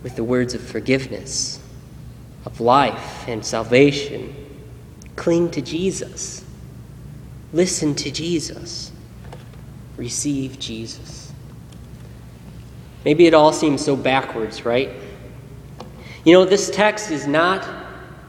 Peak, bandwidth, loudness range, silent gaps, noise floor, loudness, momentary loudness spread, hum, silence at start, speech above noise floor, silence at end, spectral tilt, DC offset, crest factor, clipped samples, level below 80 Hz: 0 dBFS; 14 kHz; 11 LU; none; -39 dBFS; -19 LUFS; 25 LU; none; 0 s; 20 dB; 0 s; -4.5 dB/octave; under 0.1%; 20 dB; under 0.1%; -46 dBFS